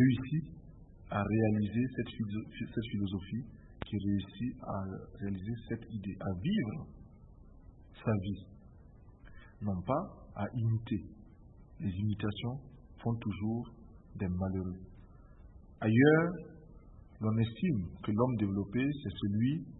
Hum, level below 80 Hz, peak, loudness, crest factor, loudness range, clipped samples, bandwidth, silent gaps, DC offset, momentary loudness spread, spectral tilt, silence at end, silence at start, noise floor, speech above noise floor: none; -56 dBFS; -12 dBFS; -35 LUFS; 22 dB; 7 LU; under 0.1%; 3.9 kHz; none; under 0.1%; 15 LU; -6.5 dB/octave; 0 s; 0 s; -56 dBFS; 22 dB